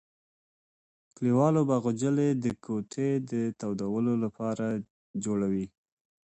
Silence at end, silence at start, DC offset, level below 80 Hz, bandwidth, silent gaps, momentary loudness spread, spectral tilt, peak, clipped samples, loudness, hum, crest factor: 0.65 s; 1.2 s; under 0.1%; -66 dBFS; 8.8 kHz; 4.90-5.14 s; 10 LU; -7.5 dB/octave; -12 dBFS; under 0.1%; -29 LUFS; none; 18 dB